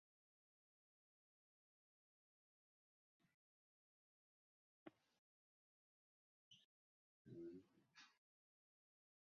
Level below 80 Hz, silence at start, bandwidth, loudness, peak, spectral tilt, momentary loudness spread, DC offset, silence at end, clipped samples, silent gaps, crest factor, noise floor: under -90 dBFS; 4.85 s; 6 kHz; -63 LUFS; -44 dBFS; -5 dB/octave; 10 LU; under 0.1%; 1.15 s; under 0.1%; 5.18-6.51 s, 6.65-7.25 s; 26 dB; under -90 dBFS